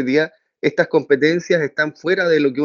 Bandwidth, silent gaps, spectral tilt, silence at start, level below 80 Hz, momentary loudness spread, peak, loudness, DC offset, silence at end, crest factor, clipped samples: 7.2 kHz; none; -4 dB/octave; 0 s; -70 dBFS; 6 LU; 0 dBFS; -18 LUFS; under 0.1%; 0 s; 16 dB; under 0.1%